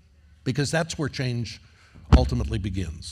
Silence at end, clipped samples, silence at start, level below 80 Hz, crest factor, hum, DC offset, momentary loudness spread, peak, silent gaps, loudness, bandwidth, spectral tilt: 0 s; under 0.1%; 0.45 s; -30 dBFS; 24 dB; none; under 0.1%; 13 LU; -2 dBFS; none; -26 LUFS; 12 kHz; -6 dB/octave